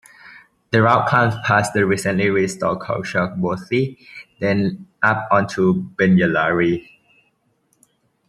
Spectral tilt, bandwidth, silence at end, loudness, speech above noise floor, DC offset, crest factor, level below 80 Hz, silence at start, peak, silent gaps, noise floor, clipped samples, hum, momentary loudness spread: -6.5 dB/octave; 12.5 kHz; 1.5 s; -18 LUFS; 47 dB; under 0.1%; 18 dB; -56 dBFS; 0.25 s; -2 dBFS; none; -65 dBFS; under 0.1%; none; 9 LU